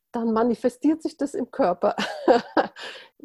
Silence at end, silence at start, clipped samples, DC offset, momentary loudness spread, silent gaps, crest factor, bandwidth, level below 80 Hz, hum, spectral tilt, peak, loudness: 0.2 s; 0.15 s; under 0.1%; under 0.1%; 9 LU; none; 20 dB; 12.5 kHz; -62 dBFS; none; -5.5 dB/octave; -4 dBFS; -24 LUFS